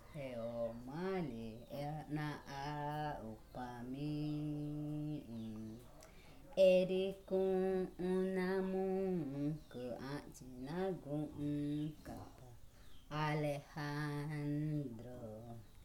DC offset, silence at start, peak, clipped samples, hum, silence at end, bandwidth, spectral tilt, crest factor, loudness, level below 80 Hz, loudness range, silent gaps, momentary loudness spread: under 0.1%; 0 s; -20 dBFS; under 0.1%; none; 0 s; 17 kHz; -7.5 dB/octave; 20 dB; -41 LUFS; -62 dBFS; 8 LU; none; 14 LU